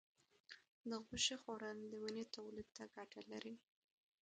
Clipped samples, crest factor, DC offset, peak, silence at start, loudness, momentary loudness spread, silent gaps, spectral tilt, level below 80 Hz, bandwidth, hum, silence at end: under 0.1%; 24 dB; under 0.1%; -26 dBFS; 0.5 s; -48 LUFS; 19 LU; 0.69-0.84 s; -2 dB/octave; -78 dBFS; 9 kHz; none; 0.65 s